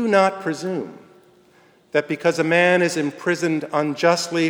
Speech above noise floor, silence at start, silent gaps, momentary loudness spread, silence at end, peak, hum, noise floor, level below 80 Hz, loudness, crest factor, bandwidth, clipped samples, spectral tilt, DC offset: 35 dB; 0 s; none; 10 LU; 0 s; -2 dBFS; none; -55 dBFS; -74 dBFS; -20 LUFS; 18 dB; over 20 kHz; under 0.1%; -4.5 dB/octave; under 0.1%